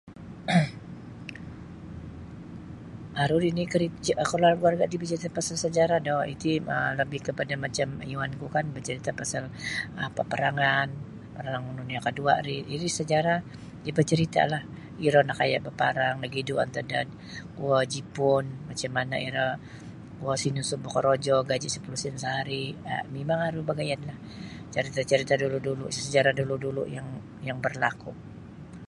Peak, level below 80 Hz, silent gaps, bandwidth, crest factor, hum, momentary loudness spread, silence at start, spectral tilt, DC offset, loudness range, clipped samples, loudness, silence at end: -6 dBFS; -56 dBFS; none; 11.5 kHz; 22 dB; none; 18 LU; 0.05 s; -5 dB/octave; under 0.1%; 5 LU; under 0.1%; -28 LUFS; 0 s